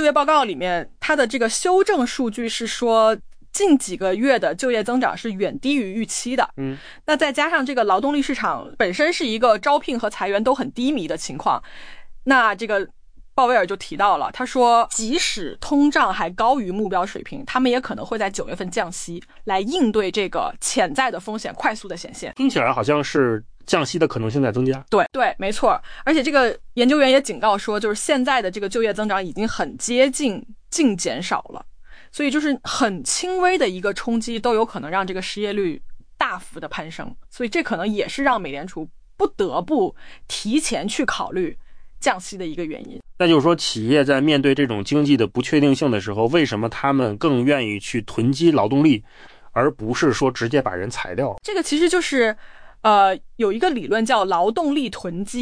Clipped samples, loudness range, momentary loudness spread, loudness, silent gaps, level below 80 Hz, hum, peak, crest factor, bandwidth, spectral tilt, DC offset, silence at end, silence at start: under 0.1%; 5 LU; 11 LU; -20 LUFS; none; -46 dBFS; none; -4 dBFS; 16 dB; 10.5 kHz; -4.5 dB/octave; under 0.1%; 0 s; 0 s